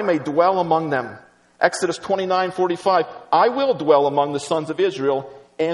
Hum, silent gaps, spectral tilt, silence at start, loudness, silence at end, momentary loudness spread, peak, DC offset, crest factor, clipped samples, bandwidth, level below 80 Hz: none; none; -5 dB/octave; 0 s; -20 LUFS; 0 s; 8 LU; 0 dBFS; under 0.1%; 18 dB; under 0.1%; 11.5 kHz; -66 dBFS